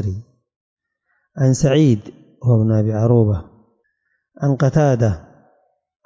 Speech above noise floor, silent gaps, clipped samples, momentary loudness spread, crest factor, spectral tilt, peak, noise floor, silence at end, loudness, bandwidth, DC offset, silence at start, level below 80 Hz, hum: 54 dB; 0.56-0.77 s; under 0.1%; 12 LU; 14 dB; -7.5 dB/octave; -4 dBFS; -69 dBFS; 0.85 s; -17 LUFS; 7.8 kHz; under 0.1%; 0 s; -42 dBFS; none